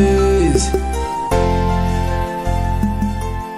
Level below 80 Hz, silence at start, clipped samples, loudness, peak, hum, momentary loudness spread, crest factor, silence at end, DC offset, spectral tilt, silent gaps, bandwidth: -22 dBFS; 0 s; under 0.1%; -18 LUFS; -2 dBFS; none; 7 LU; 14 dB; 0 s; 0.4%; -6 dB/octave; none; 15 kHz